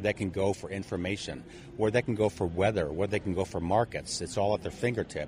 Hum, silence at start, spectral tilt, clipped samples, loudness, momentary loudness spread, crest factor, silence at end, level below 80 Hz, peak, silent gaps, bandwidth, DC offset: none; 0 s; -5.5 dB/octave; under 0.1%; -31 LUFS; 8 LU; 20 dB; 0 s; -52 dBFS; -10 dBFS; none; 15.5 kHz; under 0.1%